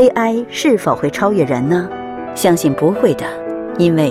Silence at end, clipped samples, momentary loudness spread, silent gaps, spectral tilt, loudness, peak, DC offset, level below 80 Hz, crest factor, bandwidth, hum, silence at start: 0 s; under 0.1%; 10 LU; none; -6 dB/octave; -16 LUFS; 0 dBFS; under 0.1%; -50 dBFS; 14 dB; 16 kHz; none; 0 s